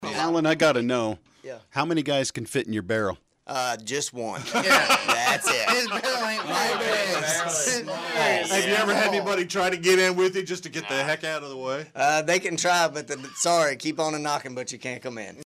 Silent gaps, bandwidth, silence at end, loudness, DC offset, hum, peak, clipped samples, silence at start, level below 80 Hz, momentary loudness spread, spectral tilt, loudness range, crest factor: none; 15.5 kHz; 0 s; -24 LUFS; under 0.1%; none; -10 dBFS; under 0.1%; 0 s; -66 dBFS; 12 LU; -2.5 dB/octave; 4 LU; 16 dB